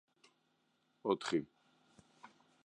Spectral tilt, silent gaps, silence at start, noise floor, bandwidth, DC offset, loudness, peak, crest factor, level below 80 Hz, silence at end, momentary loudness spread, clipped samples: -5 dB/octave; none; 1.05 s; -79 dBFS; 11 kHz; under 0.1%; -38 LUFS; -20 dBFS; 22 dB; -82 dBFS; 0.4 s; 26 LU; under 0.1%